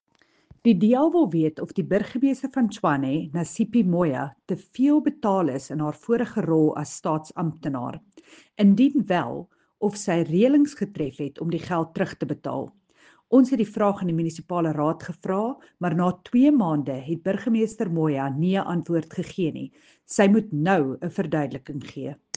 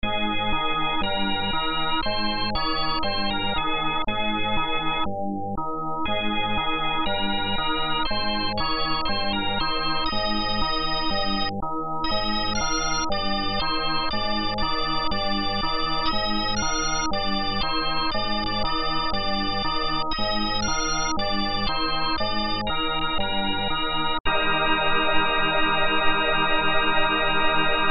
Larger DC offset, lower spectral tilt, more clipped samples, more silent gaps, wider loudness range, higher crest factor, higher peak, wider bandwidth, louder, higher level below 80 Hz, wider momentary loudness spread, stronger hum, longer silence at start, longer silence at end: neither; first, -7 dB/octave vs -3.5 dB/octave; neither; second, none vs 24.20-24.24 s; about the same, 2 LU vs 3 LU; about the same, 18 dB vs 16 dB; about the same, -6 dBFS vs -6 dBFS; first, 9.4 kHz vs 6 kHz; about the same, -24 LUFS vs -24 LUFS; second, -64 dBFS vs -34 dBFS; first, 12 LU vs 4 LU; neither; first, 0.65 s vs 0.05 s; first, 0.2 s vs 0 s